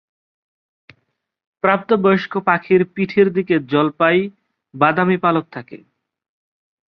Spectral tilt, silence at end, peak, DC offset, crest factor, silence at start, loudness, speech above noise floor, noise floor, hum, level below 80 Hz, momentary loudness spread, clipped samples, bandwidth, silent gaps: -9 dB/octave; 1.15 s; -2 dBFS; under 0.1%; 18 dB; 1.65 s; -17 LUFS; 44 dB; -61 dBFS; none; -62 dBFS; 6 LU; under 0.1%; 5.8 kHz; none